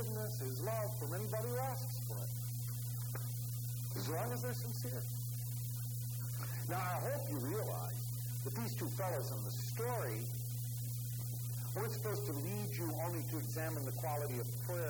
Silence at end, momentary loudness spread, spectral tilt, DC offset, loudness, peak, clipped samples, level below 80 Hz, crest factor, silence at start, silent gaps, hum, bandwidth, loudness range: 0 s; 3 LU; -5.5 dB/octave; under 0.1%; -40 LUFS; -24 dBFS; under 0.1%; -64 dBFS; 16 dB; 0 s; none; 60 Hz at -40 dBFS; over 20 kHz; 1 LU